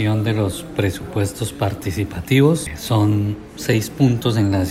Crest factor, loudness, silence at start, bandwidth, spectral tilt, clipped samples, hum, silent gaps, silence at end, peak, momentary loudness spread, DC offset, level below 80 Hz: 16 dB; -20 LUFS; 0 s; 16 kHz; -6 dB/octave; under 0.1%; none; none; 0 s; -2 dBFS; 8 LU; under 0.1%; -44 dBFS